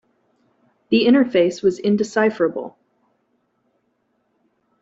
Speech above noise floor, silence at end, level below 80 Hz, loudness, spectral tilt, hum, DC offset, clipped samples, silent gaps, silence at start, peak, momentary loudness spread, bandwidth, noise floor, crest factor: 51 dB; 2.1 s; -64 dBFS; -18 LUFS; -6 dB/octave; none; under 0.1%; under 0.1%; none; 0.9 s; -4 dBFS; 8 LU; 8 kHz; -68 dBFS; 18 dB